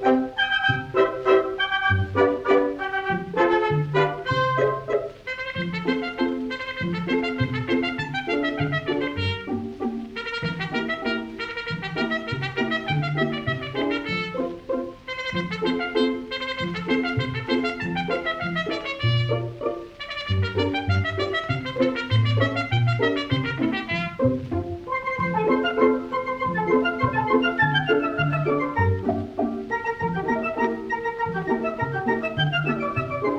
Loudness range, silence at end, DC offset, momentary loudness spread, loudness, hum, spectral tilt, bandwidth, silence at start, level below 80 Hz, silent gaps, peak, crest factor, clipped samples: 5 LU; 0 s; under 0.1%; 8 LU; -24 LUFS; none; -7 dB/octave; 8.6 kHz; 0 s; -50 dBFS; none; -6 dBFS; 18 dB; under 0.1%